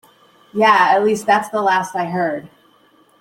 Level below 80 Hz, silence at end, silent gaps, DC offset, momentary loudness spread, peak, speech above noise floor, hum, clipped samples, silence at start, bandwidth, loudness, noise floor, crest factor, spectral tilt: -64 dBFS; 0.75 s; none; under 0.1%; 10 LU; -2 dBFS; 38 dB; none; under 0.1%; 0.55 s; 16.5 kHz; -16 LUFS; -54 dBFS; 16 dB; -4.5 dB/octave